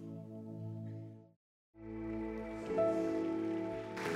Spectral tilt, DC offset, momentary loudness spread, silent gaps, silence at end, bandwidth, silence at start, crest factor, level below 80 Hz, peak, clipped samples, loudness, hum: -7 dB/octave; under 0.1%; 16 LU; 1.36-1.73 s; 0 s; 13.5 kHz; 0 s; 18 dB; -62 dBFS; -22 dBFS; under 0.1%; -39 LUFS; none